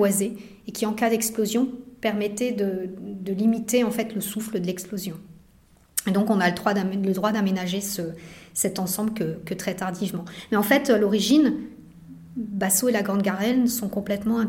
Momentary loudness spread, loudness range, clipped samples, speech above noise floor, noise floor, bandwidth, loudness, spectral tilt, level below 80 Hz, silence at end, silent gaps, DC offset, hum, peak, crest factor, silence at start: 12 LU; 4 LU; under 0.1%; 32 dB; -56 dBFS; 16.5 kHz; -24 LUFS; -4.5 dB/octave; -58 dBFS; 0 s; none; under 0.1%; none; -4 dBFS; 22 dB; 0 s